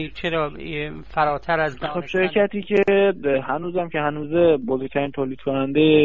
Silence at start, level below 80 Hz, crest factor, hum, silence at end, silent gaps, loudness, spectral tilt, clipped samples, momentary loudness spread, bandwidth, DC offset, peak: 0 s; -48 dBFS; 16 dB; none; 0 s; none; -22 LUFS; -8 dB/octave; under 0.1%; 9 LU; 7.2 kHz; 1%; -6 dBFS